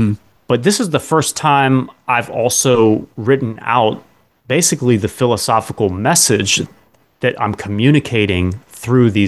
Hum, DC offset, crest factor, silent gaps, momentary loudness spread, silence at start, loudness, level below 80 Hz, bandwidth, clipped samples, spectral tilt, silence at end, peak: none; under 0.1%; 14 dB; none; 8 LU; 0 s; -15 LUFS; -40 dBFS; 13 kHz; under 0.1%; -4.5 dB/octave; 0 s; 0 dBFS